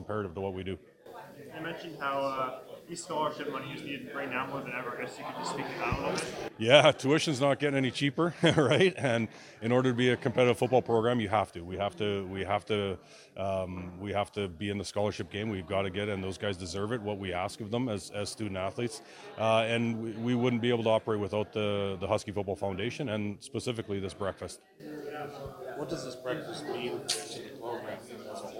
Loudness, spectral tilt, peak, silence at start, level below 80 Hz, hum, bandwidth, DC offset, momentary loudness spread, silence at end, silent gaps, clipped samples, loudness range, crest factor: -31 LUFS; -5 dB/octave; -4 dBFS; 0 s; -62 dBFS; none; 16.5 kHz; under 0.1%; 14 LU; 0 s; none; under 0.1%; 10 LU; 28 dB